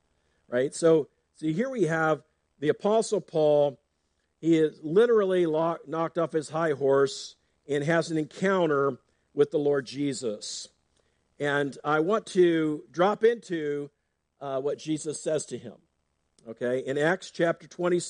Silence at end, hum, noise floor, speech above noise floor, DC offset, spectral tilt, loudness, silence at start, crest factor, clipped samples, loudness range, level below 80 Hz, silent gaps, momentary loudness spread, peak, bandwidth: 0 s; none; -76 dBFS; 50 dB; under 0.1%; -5.5 dB/octave; -27 LUFS; 0.5 s; 18 dB; under 0.1%; 5 LU; -74 dBFS; none; 12 LU; -10 dBFS; 10 kHz